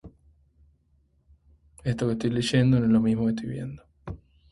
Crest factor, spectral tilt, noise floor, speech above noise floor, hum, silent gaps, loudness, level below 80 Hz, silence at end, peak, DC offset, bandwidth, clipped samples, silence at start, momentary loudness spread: 20 dB; -7 dB/octave; -66 dBFS; 42 dB; none; none; -25 LUFS; -52 dBFS; 0.35 s; -8 dBFS; under 0.1%; 11.5 kHz; under 0.1%; 0.05 s; 21 LU